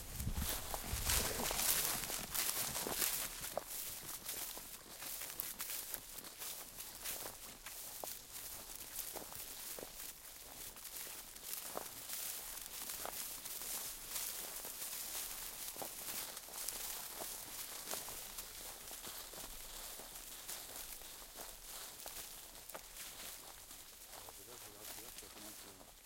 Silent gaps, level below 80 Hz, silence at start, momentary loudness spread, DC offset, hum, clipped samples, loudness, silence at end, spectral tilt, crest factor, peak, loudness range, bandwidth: none; -58 dBFS; 0 s; 13 LU; under 0.1%; none; under 0.1%; -43 LUFS; 0 s; -1 dB/octave; 34 dB; -12 dBFS; 11 LU; 17 kHz